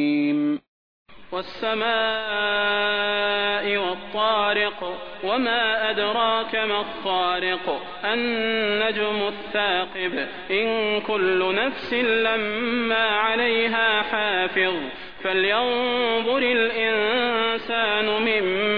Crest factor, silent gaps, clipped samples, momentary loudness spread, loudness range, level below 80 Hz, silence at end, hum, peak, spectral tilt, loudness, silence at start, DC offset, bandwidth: 16 dB; 0.68-1.06 s; under 0.1%; 6 LU; 2 LU; -58 dBFS; 0 s; none; -8 dBFS; -6 dB/octave; -22 LUFS; 0 s; 0.6%; 5.4 kHz